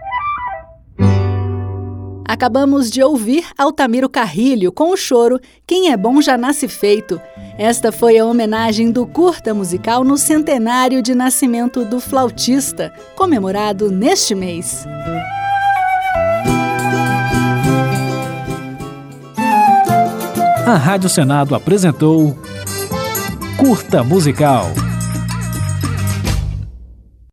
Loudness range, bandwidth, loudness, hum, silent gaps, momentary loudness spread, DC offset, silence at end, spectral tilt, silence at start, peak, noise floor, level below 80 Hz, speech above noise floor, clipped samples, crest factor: 3 LU; 19 kHz; -15 LUFS; none; none; 11 LU; under 0.1%; 0.3 s; -5 dB/octave; 0 s; 0 dBFS; -39 dBFS; -36 dBFS; 26 dB; under 0.1%; 14 dB